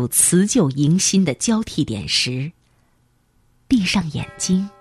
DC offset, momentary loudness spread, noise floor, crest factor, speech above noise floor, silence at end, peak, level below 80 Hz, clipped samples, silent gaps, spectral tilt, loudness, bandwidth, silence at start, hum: under 0.1%; 10 LU; -61 dBFS; 18 dB; 42 dB; 0.1 s; -2 dBFS; -48 dBFS; under 0.1%; none; -4 dB/octave; -18 LUFS; 14 kHz; 0 s; none